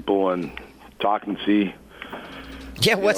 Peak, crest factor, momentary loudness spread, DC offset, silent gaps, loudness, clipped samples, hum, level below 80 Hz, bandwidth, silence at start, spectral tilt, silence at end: -6 dBFS; 18 dB; 17 LU; under 0.1%; none; -23 LUFS; under 0.1%; none; -50 dBFS; 16 kHz; 0 s; -4.5 dB/octave; 0 s